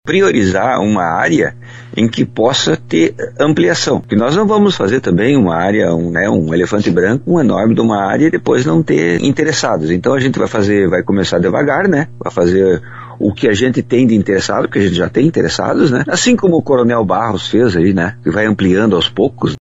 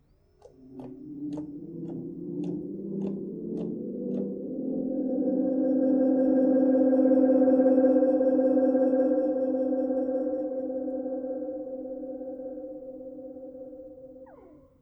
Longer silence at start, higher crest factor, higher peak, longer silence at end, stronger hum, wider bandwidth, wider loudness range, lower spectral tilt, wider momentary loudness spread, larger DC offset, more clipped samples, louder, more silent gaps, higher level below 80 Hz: second, 0.05 s vs 0.6 s; about the same, 12 dB vs 16 dB; first, 0 dBFS vs -10 dBFS; second, 0 s vs 0.35 s; neither; first, 8 kHz vs 1.9 kHz; second, 1 LU vs 14 LU; second, -5.5 dB/octave vs -11 dB/octave; second, 4 LU vs 20 LU; neither; neither; first, -13 LUFS vs -26 LUFS; neither; first, -44 dBFS vs -66 dBFS